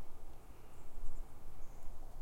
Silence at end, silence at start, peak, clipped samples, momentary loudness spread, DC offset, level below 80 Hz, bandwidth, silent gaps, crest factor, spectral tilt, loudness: 0 s; 0 s; -22 dBFS; under 0.1%; 6 LU; under 0.1%; -46 dBFS; 7.6 kHz; none; 14 dB; -5.5 dB/octave; -57 LUFS